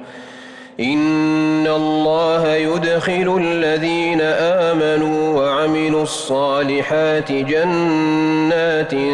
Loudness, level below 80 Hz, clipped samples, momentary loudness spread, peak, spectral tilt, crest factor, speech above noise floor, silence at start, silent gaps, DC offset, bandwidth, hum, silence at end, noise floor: -17 LUFS; -54 dBFS; under 0.1%; 3 LU; -8 dBFS; -5.5 dB/octave; 8 dB; 21 dB; 0 s; none; under 0.1%; 11 kHz; none; 0 s; -37 dBFS